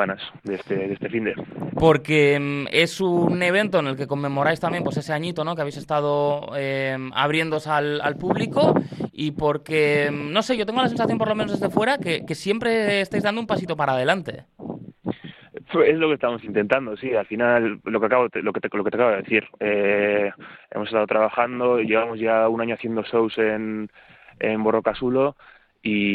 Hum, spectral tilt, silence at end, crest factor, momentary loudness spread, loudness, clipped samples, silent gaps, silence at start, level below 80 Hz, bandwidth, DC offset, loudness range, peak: none; -6 dB/octave; 0 s; 20 dB; 9 LU; -22 LUFS; under 0.1%; none; 0 s; -56 dBFS; 13 kHz; under 0.1%; 3 LU; -2 dBFS